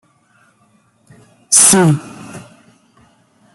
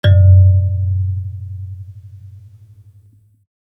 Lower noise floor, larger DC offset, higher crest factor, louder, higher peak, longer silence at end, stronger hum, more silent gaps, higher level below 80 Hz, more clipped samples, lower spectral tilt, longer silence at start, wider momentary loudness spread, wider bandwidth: first, -55 dBFS vs -49 dBFS; neither; about the same, 18 dB vs 14 dB; first, -9 LUFS vs -13 LUFS; about the same, 0 dBFS vs -2 dBFS; second, 1.15 s vs 1.4 s; neither; neither; second, -56 dBFS vs -48 dBFS; neither; second, -3.5 dB/octave vs -9 dB/octave; first, 1.5 s vs 0.05 s; first, 27 LU vs 23 LU; first, over 20 kHz vs 3.7 kHz